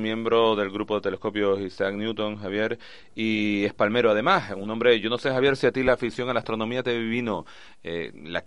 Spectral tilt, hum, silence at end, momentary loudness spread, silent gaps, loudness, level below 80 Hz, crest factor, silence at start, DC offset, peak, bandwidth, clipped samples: -6 dB/octave; none; 0.05 s; 11 LU; none; -25 LUFS; -56 dBFS; 20 dB; 0 s; 0.4%; -6 dBFS; 11 kHz; under 0.1%